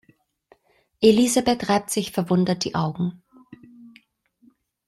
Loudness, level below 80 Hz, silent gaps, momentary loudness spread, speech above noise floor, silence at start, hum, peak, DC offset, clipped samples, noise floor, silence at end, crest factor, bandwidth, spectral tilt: -21 LUFS; -58 dBFS; none; 9 LU; 41 dB; 1 s; none; -4 dBFS; under 0.1%; under 0.1%; -62 dBFS; 1 s; 20 dB; 14 kHz; -5 dB/octave